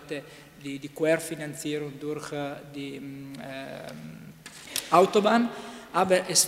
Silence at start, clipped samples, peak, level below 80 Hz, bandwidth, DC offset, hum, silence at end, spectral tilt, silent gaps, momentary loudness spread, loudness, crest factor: 0 s; under 0.1%; -6 dBFS; -66 dBFS; 16 kHz; under 0.1%; none; 0 s; -3 dB/octave; none; 20 LU; -27 LUFS; 22 dB